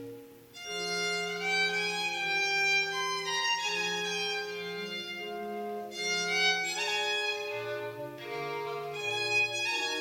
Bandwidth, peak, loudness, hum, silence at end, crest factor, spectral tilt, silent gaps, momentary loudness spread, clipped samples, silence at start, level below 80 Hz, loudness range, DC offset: 18 kHz; -16 dBFS; -30 LUFS; none; 0 s; 16 dB; -1.5 dB/octave; none; 12 LU; under 0.1%; 0 s; -78 dBFS; 3 LU; under 0.1%